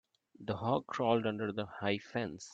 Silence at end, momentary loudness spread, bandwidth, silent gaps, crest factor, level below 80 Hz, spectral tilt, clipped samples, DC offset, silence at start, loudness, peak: 0 s; 8 LU; 8.6 kHz; none; 20 dB; -72 dBFS; -6 dB/octave; under 0.1%; under 0.1%; 0.4 s; -35 LUFS; -16 dBFS